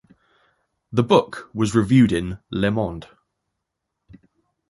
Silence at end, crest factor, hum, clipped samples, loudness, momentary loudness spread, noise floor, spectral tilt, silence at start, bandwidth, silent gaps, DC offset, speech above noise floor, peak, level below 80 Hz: 1.65 s; 20 dB; none; under 0.1%; -20 LUFS; 12 LU; -80 dBFS; -7 dB/octave; 0.9 s; 11.5 kHz; none; under 0.1%; 60 dB; -2 dBFS; -46 dBFS